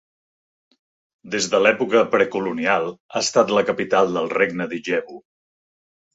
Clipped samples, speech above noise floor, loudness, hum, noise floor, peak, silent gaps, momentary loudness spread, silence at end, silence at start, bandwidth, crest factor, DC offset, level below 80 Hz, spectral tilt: under 0.1%; over 70 dB; -20 LUFS; none; under -90 dBFS; -2 dBFS; 3.00-3.09 s; 8 LU; 0.95 s; 1.25 s; 8 kHz; 20 dB; under 0.1%; -66 dBFS; -3.5 dB/octave